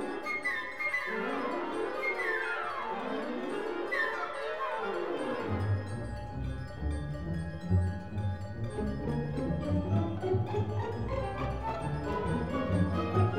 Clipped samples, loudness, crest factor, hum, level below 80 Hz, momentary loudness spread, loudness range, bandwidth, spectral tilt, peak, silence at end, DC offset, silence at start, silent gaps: under 0.1%; -34 LUFS; 18 dB; none; -46 dBFS; 6 LU; 2 LU; 11.5 kHz; -7.5 dB/octave; -16 dBFS; 0 s; 0.4%; 0 s; none